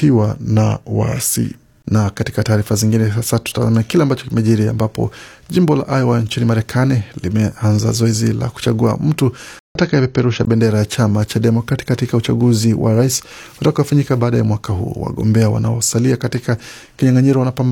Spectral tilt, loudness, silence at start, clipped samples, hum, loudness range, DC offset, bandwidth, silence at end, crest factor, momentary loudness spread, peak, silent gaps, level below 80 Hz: -6 dB/octave; -16 LUFS; 0 s; under 0.1%; none; 1 LU; under 0.1%; 17 kHz; 0 s; 14 dB; 6 LU; -2 dBFS; 9.60-9.75 s; -44 dBFS